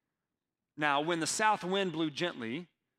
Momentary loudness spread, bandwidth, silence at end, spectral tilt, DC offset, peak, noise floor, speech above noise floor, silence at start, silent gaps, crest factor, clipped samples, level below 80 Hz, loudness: 11 LU; 16 kHz; 0.35 s; -3.5 dB/octave; under 0.1%; -14 dBFS; -90 dBFS; 58 dB; 0.75 s; none; 20 dB; under 0.1%; -80 dBFS; -32 LUFS